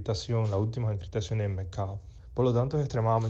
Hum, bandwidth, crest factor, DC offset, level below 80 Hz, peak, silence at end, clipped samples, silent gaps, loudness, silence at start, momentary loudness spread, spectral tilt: none; 7.8 kHz; 16 dB; under 0.1%; -48 dBFS; -14 dBFS; 0 s; under 0.1%; none; -30 LUFS; 0 s; 9 LU; -7.5 dB/octave